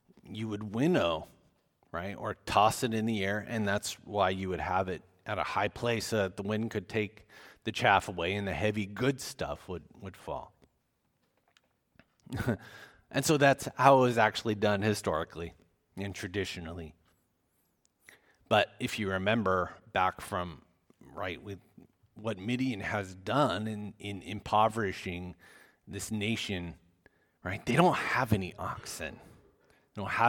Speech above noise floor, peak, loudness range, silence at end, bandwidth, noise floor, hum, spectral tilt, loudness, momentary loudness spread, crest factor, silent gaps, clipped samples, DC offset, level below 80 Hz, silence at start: 45 dB; -6 dBFS; 9 LU; 0 s; 19 kHz; -76 dBFS; none; -5 dB/octave; -31 LUFS; 16 LU; 26 dB; none; under 0.1%; under 0.1%; -58 dBFS; 0.25 s